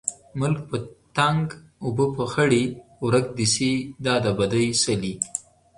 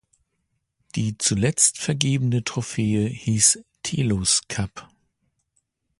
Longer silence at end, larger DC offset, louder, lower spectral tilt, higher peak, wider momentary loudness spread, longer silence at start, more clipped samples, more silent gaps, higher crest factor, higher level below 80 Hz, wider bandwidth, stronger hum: second, 0.35 s vs 1.15 s; neither; second, -24 LUFS vs -21 LUFS; about the same, -4.5 dB/octave vs -3.5 dB/octave; second, -4 dBFS vs 0 dBFS; about the same, 9 LU vs 11 LU; second, 0.05 s vs 0.95 s; neither; neither; about the same, 20 dB vs 24 dB; about the same, -54 dBFS vs -50 dBFS; about the same, 11.5 kHz vs 11.5 kHz; neither